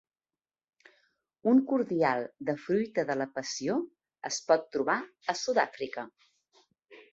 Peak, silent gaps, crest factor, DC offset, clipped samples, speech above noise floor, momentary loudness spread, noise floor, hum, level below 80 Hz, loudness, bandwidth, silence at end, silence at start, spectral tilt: -10 dBFS; none; 22 dB; under 0.1%; under 0.1%; over 61 dB; 12 LU; under -90 dBFS; none; -76 dBFS; -30 LUFS; 8 kHz; 0.1 s; 1.45 s; -4.5 dB/octave